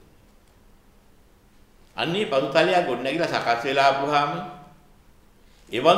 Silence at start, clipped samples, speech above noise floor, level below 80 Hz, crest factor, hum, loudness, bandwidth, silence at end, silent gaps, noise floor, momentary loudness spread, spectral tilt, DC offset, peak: 1.95 s; under 0.1%; 32 dB; -58 dBFS; 22 dB; none; -22 LUFS; 14.5 kHz; 0 s; none; -55 dBFS; 12 LU; -4.5 dB/octave; under 0.1%; -2 dBFS